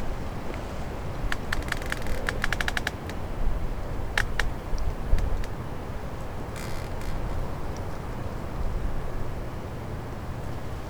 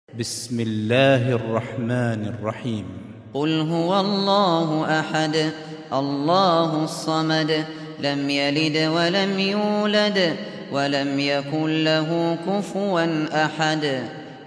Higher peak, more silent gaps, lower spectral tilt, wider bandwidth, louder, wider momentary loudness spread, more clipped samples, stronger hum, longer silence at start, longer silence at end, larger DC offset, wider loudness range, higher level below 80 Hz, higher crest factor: about the same, -6 dBFS vs -4 dBFS; neither; about the same, -5 dB/octave vs -5.5 dB/octave; first, 19.5 kHz vs 11 kHz; second, -33 LUFS vs -22 LUFS; second, 7 LU vs 10 LU; neither; neither; second, 0 s vs 0.15 s; about the same, 0 s vs 0 s; neither; first, 5 LU vs 2 LU; first, -32 dBFS vs -66 dBFS; about the same, 22 dB vs 18 dB